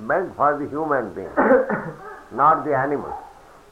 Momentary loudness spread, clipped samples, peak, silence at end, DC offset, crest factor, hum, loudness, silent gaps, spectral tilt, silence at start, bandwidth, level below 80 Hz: 17 LU; under 0.1%; -4 dBFS; 0.4 s; under 0.1%; 18 dB; none; -21 LUFS; none; -8.5 dB/octave; 0 s; 10.5 kHz; -54 dBFS